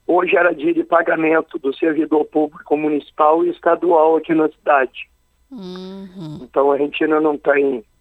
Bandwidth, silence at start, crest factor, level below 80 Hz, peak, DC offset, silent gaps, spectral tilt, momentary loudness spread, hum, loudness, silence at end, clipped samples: 5.6 kHz; 0.1 s; 18 dB; -60 dBFS; 0 dBFS; under 0.1%; none; -7.5 dB/octave; 17 LU; none; -17 LUFS; 0.2 s; under 0.1%